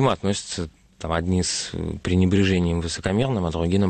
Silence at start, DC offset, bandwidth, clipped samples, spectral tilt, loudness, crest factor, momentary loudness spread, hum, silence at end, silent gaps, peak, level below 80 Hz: 0 s; under 0.1%; 9.4 kHz; under 0.1%; -5.5 dB/octave; -23 LUFS; 14 dB; 10 LU; none; 0 s; none; -8 dBFS; -40 dBFS